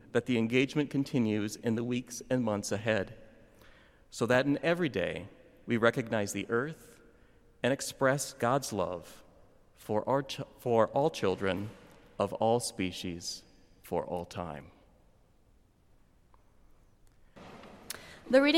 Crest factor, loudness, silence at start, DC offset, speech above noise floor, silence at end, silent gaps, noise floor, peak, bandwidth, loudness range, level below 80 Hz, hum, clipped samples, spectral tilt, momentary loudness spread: 22 dB; -32 LUFS; 0.15 s; under 0.1%; 33 dB; 0 s; none; -64 dBFS; -12 dBFS; 16.5 kHz; 11 LU; -64 dBFS; none; under 0.1%; -5 dB/octave; 16 LU